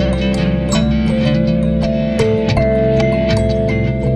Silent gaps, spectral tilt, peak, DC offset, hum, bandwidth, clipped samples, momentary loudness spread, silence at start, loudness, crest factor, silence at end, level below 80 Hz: none; -7 dB/octave; -2 dBFS; under 0.1%; none; 10.5 kHz; under 0.1%; 2 LU; 0 s; -15 LUFS; 12 dB; 0 s; -24 dBFS